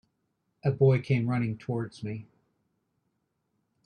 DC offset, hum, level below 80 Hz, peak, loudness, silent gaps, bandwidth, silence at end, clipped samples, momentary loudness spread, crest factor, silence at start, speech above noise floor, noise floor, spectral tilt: under 0.1%; none; -66 dBFS; -12 dBFS; -28 LUFS; none; 9 kHz; 1.6 s; under 0.1%; 15 LU; 20 dB; 0.65 s; 51 dB; -78 dBFS; -9 dB/octave